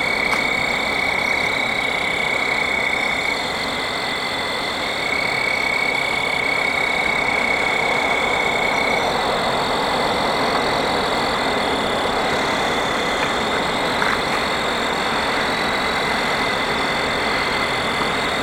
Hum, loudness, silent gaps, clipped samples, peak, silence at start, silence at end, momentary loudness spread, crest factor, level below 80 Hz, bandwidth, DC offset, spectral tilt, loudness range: none; -19 LUFS; none; under 0.1%; -4 dBFS; 0 s; 0 s; 2 LU; 16 dB; -44 dBFS; 17 kHz; under 0.1%; -3 dB/octave; 2 LU